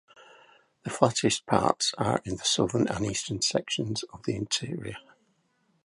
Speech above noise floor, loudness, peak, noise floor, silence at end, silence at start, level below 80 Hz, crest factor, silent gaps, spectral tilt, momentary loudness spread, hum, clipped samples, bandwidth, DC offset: 43 dB; -28 LUFS; -4 dBFS; -71 dBFS; 0.85 s; 0.2 s; -56 dBFS; 26 dB; none; -4 dB/octave; 12 LU; none; under 0.1%; 11.5 kHz; under 0.1%